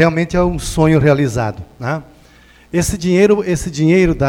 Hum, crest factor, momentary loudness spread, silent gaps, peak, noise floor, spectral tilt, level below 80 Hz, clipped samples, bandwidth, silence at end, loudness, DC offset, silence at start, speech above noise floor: none; 14 dB; 11 LU; none; 0 dBFS; -45 dBFS; -6.5 dB/octave; -32 dBFS; under 0.1%; 17 kHz; 0 s; -15 LUFS; under 0.1%; 0 s; 31 dB